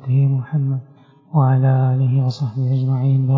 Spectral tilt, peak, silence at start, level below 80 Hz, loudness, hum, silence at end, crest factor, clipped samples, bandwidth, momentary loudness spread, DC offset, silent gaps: -10 dB/octave; -4 dBFS; 0 s; -60 dBFS; -18 LUFS; none; 0 s; 14 dB; under 0.1%; 5.8 kHz; 7 LU; under 0.1%; none